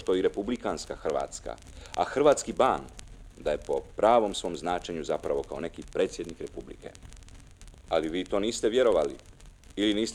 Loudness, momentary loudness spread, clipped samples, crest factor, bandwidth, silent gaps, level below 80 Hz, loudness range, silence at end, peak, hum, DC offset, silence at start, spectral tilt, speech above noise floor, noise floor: -29 LUFS; 19 LU; under 0.1%; 20 dB; 13 kHz; none; -50 dBFS; 7 LU; 0 s; -8 dBFS; none; under 0.1%; 0 s; -4 dB/octave; 21 dB; -49 dBFS